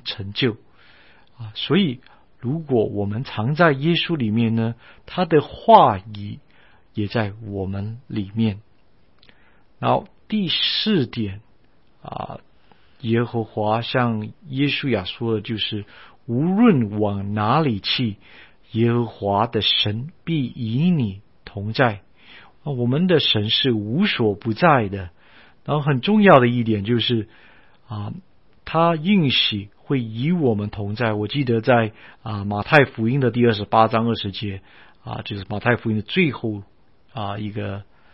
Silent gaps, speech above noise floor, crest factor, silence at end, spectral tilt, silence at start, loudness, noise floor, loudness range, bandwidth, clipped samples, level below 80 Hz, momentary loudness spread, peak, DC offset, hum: none; 39 dB; 22 dB; 0.3 s; -9 dB/octave; 0.05 s; -20 LUFS; -59 dBFS; 6 LU; 5.8 kHz; under 0.1%; -54 dBFS; 17 LU; 0 dBFS; 0.3%; none